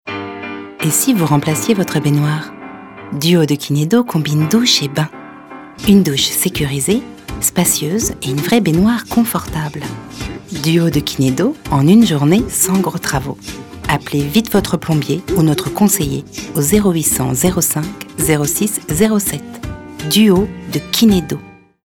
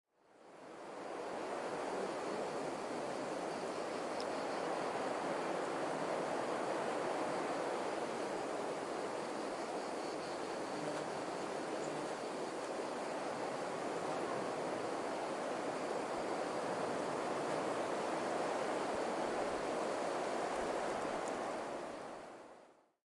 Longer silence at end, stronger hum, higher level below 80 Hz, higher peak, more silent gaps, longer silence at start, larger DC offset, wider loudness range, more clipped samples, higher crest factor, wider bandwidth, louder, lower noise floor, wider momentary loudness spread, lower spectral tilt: about the same, 0.35 s vs 0.3 s; neither; first, -38 dBFS vs -76 dBFS; first, 0 dBFS vs -26 dBFS; neither; second, 0.05 s vs 0.35 s; neither; about the same, 2 LU vs 3 LU; neither; about the same, 14 dB vs 14 dB; first, 19 kHz vs 11.5 kHz; first, -14 LUFS vs -40 LUFS; second, -34 dBFS vs -63 dBFS; first, 15 LU vs 4 LU; about the same, -4.5 dB/octave vs -4 dB/octave